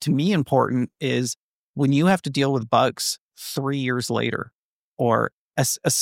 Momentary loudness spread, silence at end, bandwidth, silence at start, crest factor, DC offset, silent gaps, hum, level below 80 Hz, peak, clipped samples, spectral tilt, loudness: 11 LU; 0 s; 16.5 kHz; 0 s; 18 dB; under 0.1%; 1.37-1.74 s, 3.20-3.29 s, 4.54-4.97 s, 5.33-5.51 s; none; -64 dBFS; -4 dBFS; under 0.1%; -4.5 dB/octave; -23 LUFS